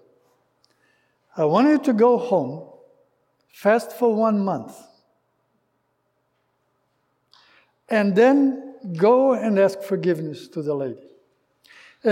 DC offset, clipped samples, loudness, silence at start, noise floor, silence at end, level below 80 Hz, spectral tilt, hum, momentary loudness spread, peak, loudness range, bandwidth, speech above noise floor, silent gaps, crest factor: under 0.1%; under 0.1%; -20 LUFS; 1.35 s; -71 dBFS; 0 s; -80 dBFS; -7.5 dB/octave; none; 15 LU; -6 dBFS; 7 LU; 16.5 kHz; 51 dB; none; 16 dB